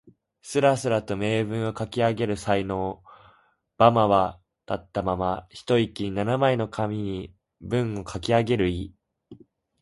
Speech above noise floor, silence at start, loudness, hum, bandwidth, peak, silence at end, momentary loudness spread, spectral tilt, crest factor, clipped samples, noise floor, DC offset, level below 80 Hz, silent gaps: 38 dB; 0.05 s; -25 LUFS; none; 11.5 kHz; -4 dBFS; 0.45 s; 13 LU; -6.5 dB/octave; 22 dB; under 0.1%; -62 dBFS; under 0.1%; -48 dBFS; none